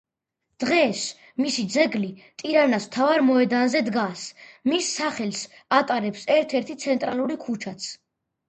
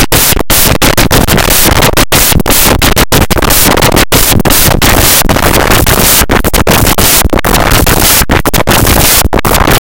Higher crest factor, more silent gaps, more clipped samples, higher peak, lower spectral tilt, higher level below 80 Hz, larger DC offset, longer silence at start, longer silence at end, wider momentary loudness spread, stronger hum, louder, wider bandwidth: first, 20 dB vs 6 dB; neither; second, under 0.1% vs 7%; second, -4 dBFS vs 0 dBFS; about the same, -4 dB/octave vs -3 dB/octave; second, -70 dBFS vs -14 dBFS; second, under 0.1% vs 5%; first, 0.6 s vs 0 s; first, 0.55 s vs 0.05 s; first, 12 LU vs 3 LU; neither; second, -23 LUFS vs -5 LUFS; second, 9 kHz vs over 20 kHz